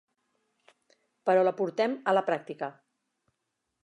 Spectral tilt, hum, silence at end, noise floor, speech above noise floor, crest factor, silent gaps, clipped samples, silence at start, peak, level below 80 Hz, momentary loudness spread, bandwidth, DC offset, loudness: -6.5 dB/octave; none; 1.15 s; -82 dBFS; 55 dB; 20 dB; none; under 0.1%; 1.25 s; -12 dBFS; -88 dBFS; 13 LU; 9 kHz; under 0.1%; -28 LUFS